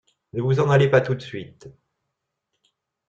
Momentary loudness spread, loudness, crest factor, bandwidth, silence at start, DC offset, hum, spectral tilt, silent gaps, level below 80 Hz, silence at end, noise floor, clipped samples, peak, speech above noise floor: 19 LU; -20 LUFS; 20 dB; 7.6 kHz; 0.35 s; under 0.1%; none; -7.5 dB/octave; none; -58 dBFS; 1.4 s; -80 dBFS; under 0.1%; -4 dBFS; 59 dB